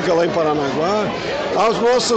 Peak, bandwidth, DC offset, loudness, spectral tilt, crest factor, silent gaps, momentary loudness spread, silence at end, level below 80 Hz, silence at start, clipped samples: -6 dBFS; 9 kHz; under 0.1%; -18 LUFS; -4 dB/octave; 12 dB; none; 5 LU; 0 s; -48 dBFS; 0 s; under 0.1%